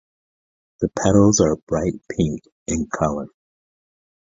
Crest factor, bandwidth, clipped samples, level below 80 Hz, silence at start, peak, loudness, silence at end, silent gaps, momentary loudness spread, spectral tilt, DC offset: 20 dB; 7.8 kHz; under 0.1%; -42 dBFS; 0.8 s; -2 dBFS; -20 LUFS; 1.1 s; 1.63-1.67 s, 2.52-2.66 s; 13 LU; -5.5 dB/octave; under 0.1%